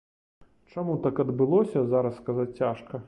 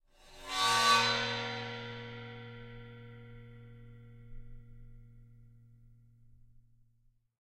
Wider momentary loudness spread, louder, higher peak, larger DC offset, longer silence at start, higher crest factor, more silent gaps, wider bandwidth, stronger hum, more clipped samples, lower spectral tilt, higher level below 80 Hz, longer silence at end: second, 8 LU vs 29 LU; first, -27 LUFS vs -30 LUFS; about the same, -12 dBFS vs -12 dBFS; neither; first, 0.75 s vs 0.25 s; second, 16 dB vs 26 dB; neither; second, 9 kHz vs 16 kHz; neither; neither; first, -10 dB/octave vs -2 dB/octave; about the same, -62 dBFS vs -58 dBFS; second, 0 s vs 1.5 s